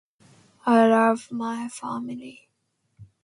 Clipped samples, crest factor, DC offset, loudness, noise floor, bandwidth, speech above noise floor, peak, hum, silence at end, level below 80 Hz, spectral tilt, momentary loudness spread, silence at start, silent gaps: under 0.1%; 20 dB; under 0.1%; -23 LUFS; -74 dBFS; 11.5 kHz; 51 dB; -6 dBFS; none; 0.2 s; -72 dBFS; -5.5 dB/octave; 18 LU; 0.65 s; none